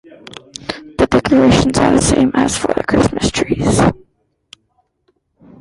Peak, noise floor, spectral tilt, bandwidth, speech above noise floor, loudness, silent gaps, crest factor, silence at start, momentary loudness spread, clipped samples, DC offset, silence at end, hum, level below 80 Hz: 0 dBFS; -63 dBFS; -5 dB/octave; 11.5 kHz; 50 dB; -13 LUFS; none; 14 dB; 0.3 s; 18 LU; under 0.1%; under 0.1%; 1.65 s; none; -32 dBFS